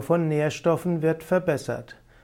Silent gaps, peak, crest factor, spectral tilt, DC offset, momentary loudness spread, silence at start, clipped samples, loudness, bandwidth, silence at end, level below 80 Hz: none; -10 dBFS; 16 dB; -7 dB/octave; under 0.1%; 7 LU; 0 s; under 0.1%; -25 LUFS; 16.5 kHz; 0.3 s; -58 dBFS